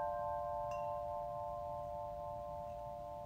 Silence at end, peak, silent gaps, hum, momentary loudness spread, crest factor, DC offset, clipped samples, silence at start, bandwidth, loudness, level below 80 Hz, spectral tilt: 0 s; -30 dBFS; none; none; 6 LU; 14 dB; under 0.1%; under 0.1%; 0 s; 16 kHz; -44 LUFS; -60 dBFS; -7 dB/octave